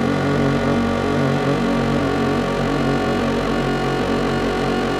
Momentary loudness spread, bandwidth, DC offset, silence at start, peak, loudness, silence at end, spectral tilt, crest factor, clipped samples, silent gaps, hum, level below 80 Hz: 2 LU; 14 kHz; under 0.1%; 0 s; -8 dBFS; -19 LUFS; 0 s; -6.5 dB/octave; 10 dB; under 0.1%; none; none; -36 dBFS